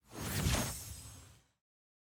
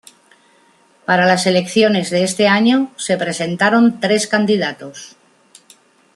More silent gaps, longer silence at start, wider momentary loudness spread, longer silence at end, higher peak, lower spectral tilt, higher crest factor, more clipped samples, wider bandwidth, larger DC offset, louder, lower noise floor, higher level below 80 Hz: neither; second, 0.1 s vs 1.1 s; first, 19 LU vs 10 LU; second, 0.8 s vs 1.05 s; second, -20 dBFS vs -2 dBFS; about the same, -3.5 dB/octave vs -4.5 dB/octave; about the same, 20 dB vs 16 dB; neither; first, over 20 kHz vs 12.5 kHz; neither; second, -37 LUFS vs -15 LUFS; first, -58 dBFS vs -53 dBFS; first, -48 dBFS vs -62 dBFS